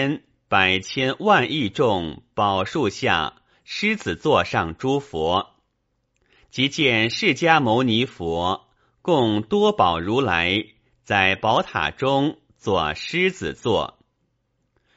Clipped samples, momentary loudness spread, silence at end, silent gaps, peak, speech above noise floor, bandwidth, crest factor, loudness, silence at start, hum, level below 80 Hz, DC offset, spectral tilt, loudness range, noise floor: under 0.1%; 8 LU; 1.1 s; none; 0 dBFS; 51 dB; 8 kHz; 22 dB; -21 LUFS; 0 s; none; -50 dBFS; under 0.1%; -3 dB/octave; 3 LU; -72 dBFS